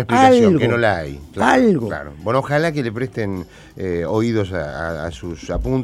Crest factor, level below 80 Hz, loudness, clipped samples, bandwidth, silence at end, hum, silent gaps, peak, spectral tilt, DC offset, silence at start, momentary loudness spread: 18 dB; -38 dBFS; -18 LUFS; under 0.1%; 13.5 kHz; 0 s; none; none; 0 dBFS; -6.5 dB/octave; under 0.1%; 0 s; 15 LU